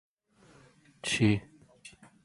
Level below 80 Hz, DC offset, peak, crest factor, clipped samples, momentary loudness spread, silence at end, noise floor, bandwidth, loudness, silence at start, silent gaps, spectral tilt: -60 dBFS; under 0.1%; -14 dBFS; 20 dB; under 0.1%; 25 LU; 0.35 s; -62 dBFS; 11.5 kHz; -29 LUFS; 1.05 s; none; -5 dB/octave